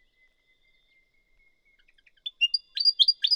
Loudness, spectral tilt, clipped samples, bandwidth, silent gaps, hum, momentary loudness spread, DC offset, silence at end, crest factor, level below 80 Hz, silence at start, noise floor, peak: -22 LUFS; 5 dB/octave; under 0.1%; 18.5 kHz; none; none; 20 LU; under 0.1%; 0 s; 22 dB; -72 dBFS; 2.25 s; -67 dBFS; -6 dBFS